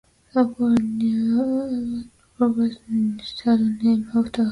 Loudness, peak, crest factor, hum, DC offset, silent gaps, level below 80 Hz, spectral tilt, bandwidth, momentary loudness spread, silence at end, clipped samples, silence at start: -22 LUFS; -8 dBFS; 14 dB; none; under 0.1%; none; -54 dBFS; -7.5 dB/octave; 11 kHz; 6 LU; 0 s; under 0.1%; 0.35 s